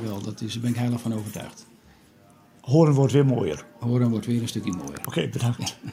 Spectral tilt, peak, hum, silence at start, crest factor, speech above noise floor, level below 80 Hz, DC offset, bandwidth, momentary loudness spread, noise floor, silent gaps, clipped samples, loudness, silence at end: -6.5 dB/octave; -6 dBFS; none; 0 s; 20 dB; 31 dB; -62 dBFS; under 0.1%; 16 kHz; 13 LU; -54 dBFS; none; under 0.1%; -24 LUFS; 0 s